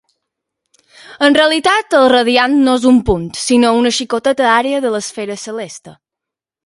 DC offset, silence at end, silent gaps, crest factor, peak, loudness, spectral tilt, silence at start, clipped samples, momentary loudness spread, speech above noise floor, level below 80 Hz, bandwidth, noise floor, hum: under 0.1%; 0.75 s; none; 14 dB; 0 dBFS; -12 LUFS; -3.5 dB/octave; 1.1 s; under 0.1%; 13 LU; 71 dB; -40 dBFS; 11.5 kHz; -84 dBFS; none